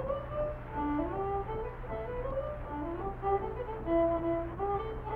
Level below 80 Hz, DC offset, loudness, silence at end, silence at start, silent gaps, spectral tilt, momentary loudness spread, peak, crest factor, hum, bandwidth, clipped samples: -44 dBFS; under 0.1%; -35 LUFS; 0 s; 0 s; none; -10 dB/octave; 9 LU; -18 dBFS; 16 dB; none; 4.6 kHz; under 0.1%